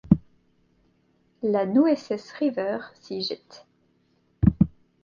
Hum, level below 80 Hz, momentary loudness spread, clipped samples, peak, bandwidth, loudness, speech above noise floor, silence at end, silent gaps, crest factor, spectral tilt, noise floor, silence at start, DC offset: none; -42 dBFS; 12 LU; under 0.1%; -2 dBFS; 7.2 kHz; -25 LUFS; 41 dB; 0.35 s; none; 24 dB; -8.5 dB/octave; -66 dBFS; 0.05 s; under 0.1%